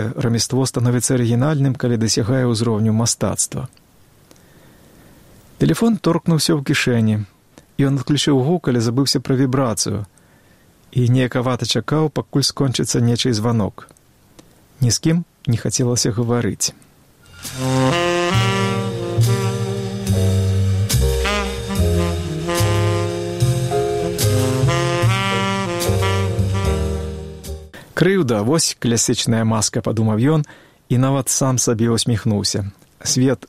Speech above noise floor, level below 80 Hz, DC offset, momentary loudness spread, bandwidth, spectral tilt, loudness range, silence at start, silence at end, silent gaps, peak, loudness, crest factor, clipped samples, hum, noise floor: 34 dB; -36 dBFS; under 0.1%; 6 LU; 16 kHz; -5 dB/octave; 3 LU; 0 s; 0.05 s; none; -2 dBFS; -18 LUFS; 18 dB; under 0.1%; none; -51 dBFS